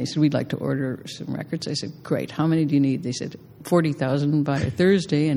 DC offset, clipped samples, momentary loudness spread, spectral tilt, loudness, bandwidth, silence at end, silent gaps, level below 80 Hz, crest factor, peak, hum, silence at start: under 0.1%; under 0.1%; 11 LU; -6.5 dB/octave; -23 LUFS; 14.5 kHz; 0 s; none; -56 dBFS; 16 dB; -6 dBFS; none; 0 s